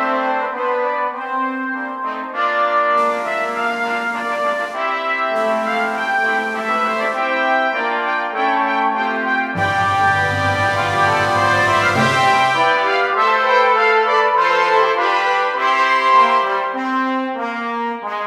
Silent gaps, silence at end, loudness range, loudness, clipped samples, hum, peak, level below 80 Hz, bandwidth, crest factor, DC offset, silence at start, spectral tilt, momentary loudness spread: none; 0 s; 5 LU; -16 LUFS; under 0.1%; none; -2 dBFS; -58 dBFS; 15.5 kHz; 14 dB; under 0.1%; 0 s; -4.5 dB/octave; 8 LU